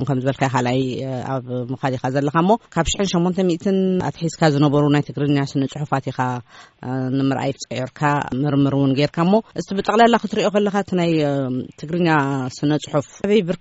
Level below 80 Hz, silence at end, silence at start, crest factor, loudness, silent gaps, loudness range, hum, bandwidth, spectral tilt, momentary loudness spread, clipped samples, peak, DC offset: -46 dBFS; 0.05 s; 0 s; 16 dB; -20 LUFS; none; 3 LU; none; 8 kHz; -5.5 dB/octave; 9 LU; under 0.1%; -4 dBFS; under 0.1%